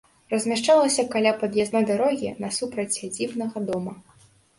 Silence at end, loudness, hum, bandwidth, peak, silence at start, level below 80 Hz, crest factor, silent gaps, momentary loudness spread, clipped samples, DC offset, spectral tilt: 0.6 s; -24 LUFS; none; 11.5 kHz; -6 dBFS; 0.3 s; -64 dBFS; 18 dB; none; 10 LU; under 0.1%; under 0.1%; -3.5 dB/octave